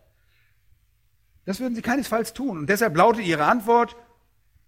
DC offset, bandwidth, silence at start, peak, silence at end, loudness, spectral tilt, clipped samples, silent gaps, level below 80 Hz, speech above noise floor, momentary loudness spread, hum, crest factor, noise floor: under 0.1%; 16.5 kHz; 1.45 s; -4 dBFS; 0.75 s; -22 LUFS; -5 dB/octave; under 0.1%; none; -58 dBFS; 44 dB; 11 LU; none; 20 dB; -65 dBFS